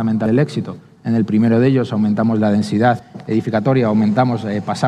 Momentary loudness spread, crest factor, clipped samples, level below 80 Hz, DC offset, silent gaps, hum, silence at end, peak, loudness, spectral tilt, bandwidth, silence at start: 7 LU; 14 dB; under 0.1%; -56 dBFS; under 0.1%; none; none; 0 s; -2 dBFS; -16 LUFS; -8 dB/octave; 10.5 kHz; 0 s